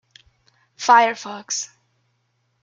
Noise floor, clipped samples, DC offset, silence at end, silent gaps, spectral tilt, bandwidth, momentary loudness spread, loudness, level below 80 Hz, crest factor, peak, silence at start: -69 dBFS; under 0.1%; under 0.1%; 1 s; none; -0.5 dB/octave; 9.2 kHz; 17 LU; -19 LUFS; -74 dBFS; 22 dB; -2 dBFS; 0.8 s